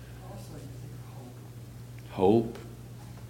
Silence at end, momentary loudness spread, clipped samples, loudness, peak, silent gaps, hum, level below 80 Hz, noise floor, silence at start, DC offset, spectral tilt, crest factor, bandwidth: 0 s; 21 LU; under 0.1%; -27 LUFS; -10 dBFS; none; none; -54 dBFS; -45 dBFS; 0 s; under 0.1%; -8 dB/octave; 22 dB; 17 kHz